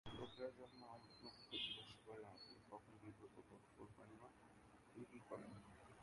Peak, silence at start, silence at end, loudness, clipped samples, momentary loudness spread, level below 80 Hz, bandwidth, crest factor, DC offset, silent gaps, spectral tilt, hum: -36 dBFS; 0.05 s; 0 s; -57 LUFS; under 0.1%; 16 LU; -78 dBFS; 11 kHz; 22 dB; under 0.1%; none; -4.5 dB/octave; none